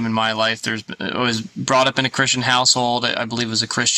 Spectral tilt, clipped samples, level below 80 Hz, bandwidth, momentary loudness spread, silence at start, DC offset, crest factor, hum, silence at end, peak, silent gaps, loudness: -2.5 dB/octave; under 0.1%; -58 dBFS; 13.5 kHz; 9 LU; 0 s; under 0.1%; 18 dB; none; 0 s; -2 dBFS; none; -18 LUFS